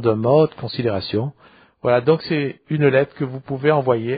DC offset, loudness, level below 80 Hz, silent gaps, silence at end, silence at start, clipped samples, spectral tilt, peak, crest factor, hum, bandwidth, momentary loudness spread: under 0.1%; -19 LUFS; -58 dBFS; none; 0 s; 0 s; under 0.1%; -6 dB/octave; -2 dBFS; 16 dB; none; 5 kHz; 9 LU